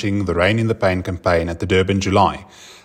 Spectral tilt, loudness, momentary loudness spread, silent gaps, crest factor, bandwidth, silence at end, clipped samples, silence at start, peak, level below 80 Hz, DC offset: -6 dB/octave; -18 LUFS; 4 LU; none; 16 dB; 10.5 kHz; 0.1 s; under 0.1%; 0 s; -2 dBFS; -44 dBFS; under 0.1%